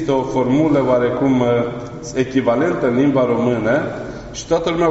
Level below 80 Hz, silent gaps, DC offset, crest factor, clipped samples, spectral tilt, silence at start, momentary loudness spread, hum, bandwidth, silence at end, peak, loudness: -44 dBFS; none; under 0.1%; 14 dB; under 0.1%; -6 dB/octave; 0 s; 10 LU; none; 8 kHz; 0 s; -2 dBFS; -17 LUFS